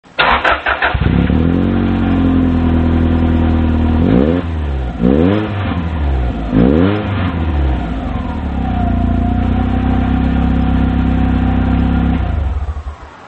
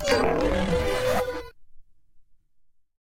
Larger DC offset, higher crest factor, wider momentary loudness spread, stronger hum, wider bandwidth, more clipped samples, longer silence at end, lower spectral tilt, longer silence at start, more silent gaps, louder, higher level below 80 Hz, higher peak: neither; about the same, 14 dB vs 18 dB; about the same, 8 LU vs 8 LU; neither; second, 4.6 kHz vs 16.5 kHz; neither; second, 0 s vs 0.8 s; first, -9 dB/octave vs -5 dB/octave; first, 0.15 s vs 0 s; neither; first, -14 LUFS vs -25 LUFS; first, -18 dBFS vs -38 dBFS; first, 0 dBFS vs -8 dBFS